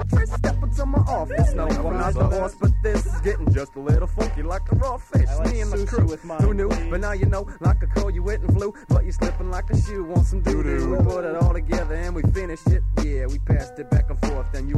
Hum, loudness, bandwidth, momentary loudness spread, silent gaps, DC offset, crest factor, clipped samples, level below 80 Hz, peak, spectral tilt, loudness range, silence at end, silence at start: none; -23 LUFS; 10 kHz; 4 LU; none; under 0.1%; 12 dB; under 0.1%; -24 dBFS; -8 dBFS; -7.5 dB/octave; 1 LU; 0 s; 0 s